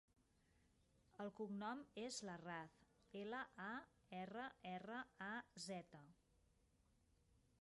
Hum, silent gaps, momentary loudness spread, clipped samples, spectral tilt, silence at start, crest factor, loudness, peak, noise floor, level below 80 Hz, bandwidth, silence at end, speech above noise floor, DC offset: none; none; 8 LU; under 0.1%; -4 dB/octave; 1.15 s; 18 dB; -53 LUFS; -38 dBFS; -79 dBFS; -84 dBFS; 11 kHz; 0.3 s; 27 dB; under 0.1%